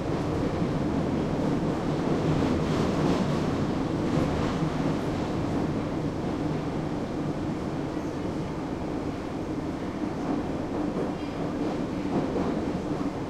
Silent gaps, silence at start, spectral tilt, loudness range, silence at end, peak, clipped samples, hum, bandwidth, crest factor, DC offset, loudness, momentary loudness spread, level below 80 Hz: none; 0 s; -7.5 dB/octave; 5 LU; 0 s; -12 dBFS; under 0.1%; none; 13 kHz; 16 dB; under 0.1%; -29 LUFS; 6 LU; -44 dBFS